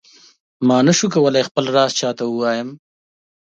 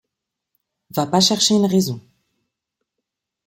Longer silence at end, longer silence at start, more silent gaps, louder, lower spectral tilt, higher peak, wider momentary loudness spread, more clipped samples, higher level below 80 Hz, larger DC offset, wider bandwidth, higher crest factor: second, 0.65 s vs 1.45 s; second, 0.6 s vs 0.95 s; first, 1.51-1.55 s vs none; about the same, -17 LUFS vs -17 LUFS; about the same, -4.5 dB/octave vs -4 dB/octave; about the same, -2 dBFS vs -2 dBFS; second, 7 LU vs 13 LU; neither; about the same, -64 dBFS vs -62 dBFS; neither; second, 9 kHz vs 16.5 kHz; about the same, 16 dB vs 20 dB